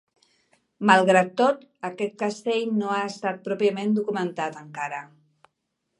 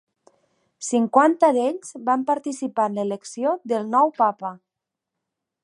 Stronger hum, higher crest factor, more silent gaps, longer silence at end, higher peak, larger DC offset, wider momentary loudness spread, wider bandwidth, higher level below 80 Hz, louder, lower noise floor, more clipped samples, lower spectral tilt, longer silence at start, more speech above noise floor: neither; about the same, 24 dB vs 20 dB; neither; about the same, 0.95 s vs 1.05 s; about the same, -2 dBFS vs -2 dBFS; neither; about the same, 13 LU vs 11 LU; about the same, 11 kHz vs 11.5 kHz; about the same, -78 dBFS vs -80 dBFS; second, -24 LUFS vs -21 LUFS; second, -78 dBFS vs -85 dBFS; neither; about the same, -5.5 dB/octave vs -5 dB/octave; about the same, 0.8 s vs 0.8 s; second, 54 dB vs 64 dB